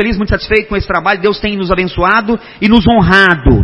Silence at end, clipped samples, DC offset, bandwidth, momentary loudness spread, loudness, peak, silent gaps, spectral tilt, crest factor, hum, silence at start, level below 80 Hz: 0 s; 0.4%; under 0.1%; 11 kHz; 8 LU; -11 LUFS; 0 dBFS; none; -7.5 dB/octave; 10 dB; none; 0 s; -22 dBFS